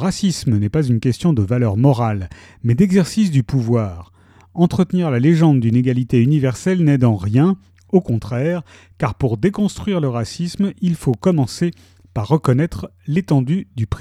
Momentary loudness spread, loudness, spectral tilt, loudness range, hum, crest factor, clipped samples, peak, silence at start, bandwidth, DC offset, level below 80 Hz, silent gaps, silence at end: 9 LU; -18 LUFS; -7.5 dB/octave; 4 LU; none; 16 dB; under 0.1%; -2 dBFS; 0 s; 13.5 kHz; under 0.1%; -42 dBFS; none; 0 s